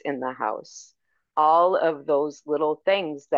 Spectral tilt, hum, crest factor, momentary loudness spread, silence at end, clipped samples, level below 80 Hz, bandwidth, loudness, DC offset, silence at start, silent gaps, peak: -4.5 dB/octave; none; 16 dB; 11 LU; 0 s; under 0.1%; -80 dBFS; 7.4 kHz; -23 LUFS; under 0.1%; 0.05 s; none; -8 dBFS